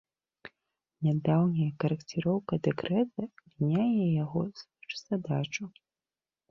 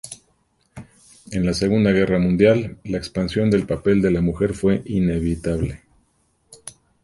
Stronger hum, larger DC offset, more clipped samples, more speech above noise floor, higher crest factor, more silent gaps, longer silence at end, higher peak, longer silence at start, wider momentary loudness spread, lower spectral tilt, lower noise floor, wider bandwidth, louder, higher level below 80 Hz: neither; neither; neither; first, over 61 dB vs 45 dB; about the same, 18 dB vs 18 dB; neither; first, 0.8 s vs 0.35 s; second, -14 dBFS vs -2 dBFS; first, 0.45 s vs 0.05 s; second, 13 LU vs 19 LU; about the same, -7.5 dB/octave vs -7 dB/octave; first, under -90 dBFS vs -64 dBFS; second, 7.2 kHz vs 11.5 kHz; second, -30 LUFS vs -20 LUFS; second, -66 dBFS vs -40 dBFS